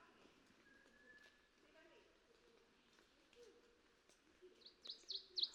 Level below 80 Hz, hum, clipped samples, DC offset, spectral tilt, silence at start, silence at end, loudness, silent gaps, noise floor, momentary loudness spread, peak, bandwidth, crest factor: -88 dBFS; none; under 0.1%; under 0.1%; -0.5 dB/octave; 0 s; 0 s; -49 LUFS; none; -75 dBFS; 21 LU; -30 dBFS; 11 kHz; 28 dB